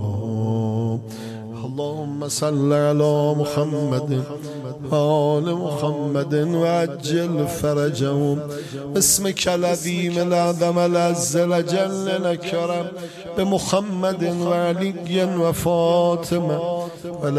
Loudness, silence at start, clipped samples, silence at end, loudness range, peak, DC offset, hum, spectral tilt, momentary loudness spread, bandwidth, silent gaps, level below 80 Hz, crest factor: -21 LUFS; 0 s; under 0.1%; 0 s; 2 LU; -4 dBFS; under 0.1%; none; -5 dB/octave; 10 LU; 14.5 kHz; none; -52 dBFS; 16 dB